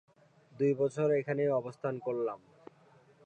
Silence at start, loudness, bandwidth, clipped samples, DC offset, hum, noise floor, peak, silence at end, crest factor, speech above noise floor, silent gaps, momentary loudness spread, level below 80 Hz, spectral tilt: 0.55 s; -32 LUFS; 8.8 kHz; under 0.1%; under 0.1%; none; -63 dBFS; -20 dBFS; 0.9 s; 14 dB; 31 dB; none; 8 LU; -84 dBFS; -8.5 dB/octave